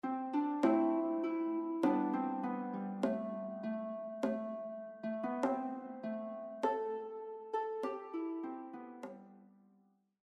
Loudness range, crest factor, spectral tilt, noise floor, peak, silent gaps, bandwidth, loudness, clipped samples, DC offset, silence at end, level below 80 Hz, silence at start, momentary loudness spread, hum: 6 LU; 20 dB; -7.5 dB/octave; -72 dBFS; -18 dBFS; none; 9 kHz; -38 LUFS; under 0.1%; under 0.1%; 0.8 s; -82 dBFS; 0.05 s; 12 LU; none